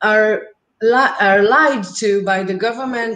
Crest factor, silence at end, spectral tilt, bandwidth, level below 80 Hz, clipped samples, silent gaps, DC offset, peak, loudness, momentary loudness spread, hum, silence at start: 14 dB; 0 s; -4 dB/octave; 9.6 kHz; -64 dBFS; under 0.1%; none; under 0.1%; -2 dBFS; -15 LUFS; 9 LU; none; 0 s